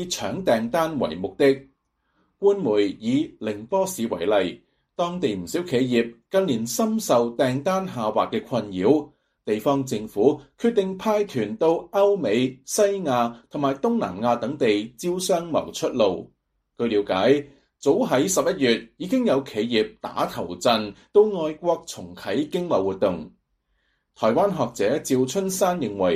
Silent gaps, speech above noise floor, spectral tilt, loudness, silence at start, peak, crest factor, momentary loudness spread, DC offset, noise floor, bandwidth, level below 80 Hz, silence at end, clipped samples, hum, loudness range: none; 49 dB; -5 dB/octave; -23 LUFS; 0 s; -4 dBFS; 18 dB; 7 LU; under 0.1%; -71 dBFS; 15 kHz; -60 dBFS; 0 s; under 0.1%; none; 2 LU